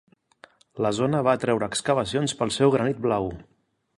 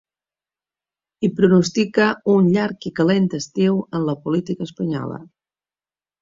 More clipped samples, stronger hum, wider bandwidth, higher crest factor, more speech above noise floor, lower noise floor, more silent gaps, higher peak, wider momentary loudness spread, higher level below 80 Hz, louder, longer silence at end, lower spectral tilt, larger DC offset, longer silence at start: neither; neither; first, 11.5 kHz vs 7.6 kHz; about the same, 18 dB vs 18 dB; second, 31 dB vs over 72 dB; second, -55 dBFS vs under -90 dBFS; neither; second, -6 dBFS vs -2 dBFS; about the same, 8 LU vs 10 LU; about the same, -54 dBFS vs -58 dBFS; second, -24 LUFS vs -19 LUFS; second, 0.55 s vs 0.95 s; second, -5 dB/octave vs -6.5 dB/octave; neither; second, 0.75 s vs 1.2 s